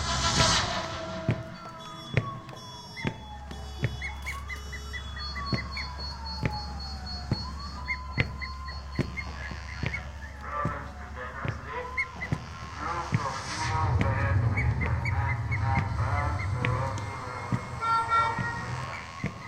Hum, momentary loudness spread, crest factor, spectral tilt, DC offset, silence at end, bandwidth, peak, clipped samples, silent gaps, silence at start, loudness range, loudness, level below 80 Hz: none; 12 LU; 24 dB; -4.5 dB/octave; under 0.1%; 0 s; 12.5 kHz; -6 dBFS; under 0.1%; none; 0 s; 7 LU; -31 LUFS; -40 dBFS